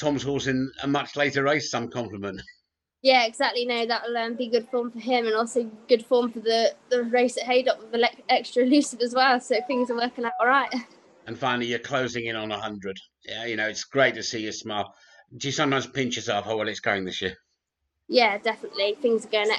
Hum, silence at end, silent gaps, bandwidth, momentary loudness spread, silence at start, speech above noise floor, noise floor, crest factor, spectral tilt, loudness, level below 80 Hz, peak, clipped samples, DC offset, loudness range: none; 0 s; none; 11 kHz; 11 LU; 0 s; 55 dB; -80 dBFS; 20 dB; -4 dB/octave; -25 LUFS; -64 dBFS; -6 dBFS; under 0.1%; under 0.1%; 5 LU